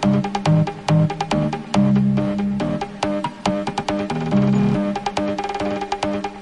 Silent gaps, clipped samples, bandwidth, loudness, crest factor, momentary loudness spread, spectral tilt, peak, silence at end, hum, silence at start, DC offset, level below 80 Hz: none; under 0.1%; 11 kHz; -20 LUFS; 14 dB; 6 LU; -7 dB/octave; -6 dBFS; 0 s; none; 0 s; under 0.1%; -44 dBFS